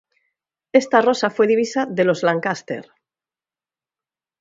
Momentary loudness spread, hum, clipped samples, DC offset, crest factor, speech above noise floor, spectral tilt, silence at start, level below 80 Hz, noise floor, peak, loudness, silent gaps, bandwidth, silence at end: 10 LU; none; under 0.1%; under 0.1%; 20 dB; over 72 dB; -5 dB/octave; 0.75 s; -70 dBFS; under -90 dBFS; 0 dBFS; -18 LUFS; none; 7.8 kHz; 1.6 s